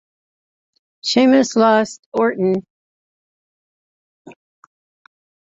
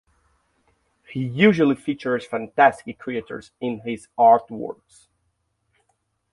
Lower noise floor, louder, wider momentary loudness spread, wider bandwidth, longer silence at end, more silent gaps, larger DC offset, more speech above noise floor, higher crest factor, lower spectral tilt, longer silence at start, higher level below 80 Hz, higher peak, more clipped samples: first, under -90 dBFS vs -72 dBFS; first, -16 LUFS vs -21 LUFS; second, 10 LU vs 18 LU; second, 7.8 kHz vs 11.5 kHz; second, 1.15 s vs 1.6 s; first, 1.99-2.12 s, 2.70-4.25 s vs none; neither; first, over 75 dB vs 51 dB; about the same, 18 dB vs 22 dB; second, -4.5 dB/octave vs -7 dB/octave; about the same, 1.05 s vs 1.1 s; about the same, -64 dBFS vs -64 dBFS; about the same, -2 dBFS vs -2 dBFS; neither